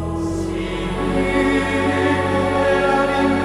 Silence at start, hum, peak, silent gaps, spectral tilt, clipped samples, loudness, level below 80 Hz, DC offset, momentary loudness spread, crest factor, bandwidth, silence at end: 0 s; none; -4 dBFS; none; -6 dB/octave; under 0.1%; -19 LUFS; -34 dBFS; under 0.1%; 7 LU; 14 dB; 14.5 kHz; 0 s